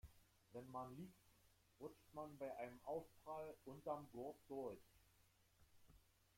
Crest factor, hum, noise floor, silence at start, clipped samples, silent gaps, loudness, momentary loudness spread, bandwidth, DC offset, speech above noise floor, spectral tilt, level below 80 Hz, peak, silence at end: 20 dB; none; -77 dBFS; 0.05 s; under 0.1%; none; -55 LUFS; 9 LU; 16.5 kHz; under 0.1%; 23 dB; -6.5 dB/octave; -78 dBFS; -34 dBFS; 0.35 s